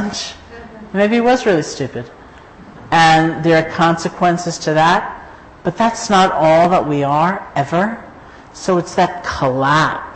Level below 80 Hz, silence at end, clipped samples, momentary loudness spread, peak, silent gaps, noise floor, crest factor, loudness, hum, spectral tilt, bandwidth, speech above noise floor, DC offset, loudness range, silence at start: -44 dBFS; 0 s; under 0.1%; 14 LU; -2 dBFS; none; -39 dBFS; 12 dB; -15 LUFS; none; -5 dB/octave; 8.8 kHz; 24 dB; under 0.1%; 2 LU; 0 s